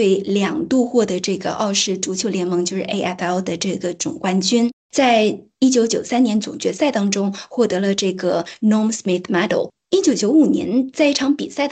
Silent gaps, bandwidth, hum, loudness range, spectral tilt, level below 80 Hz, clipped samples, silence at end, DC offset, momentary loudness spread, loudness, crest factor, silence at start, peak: 4.73-4.89 s; 9.2 kHz; none; 3 LU; -4.5 dB/octave; -62 dBFS; under 0.1%; 0 s; under 0.1%; 7 LU; -18 LUFS; 14 dB; 0 s; -4 dBFS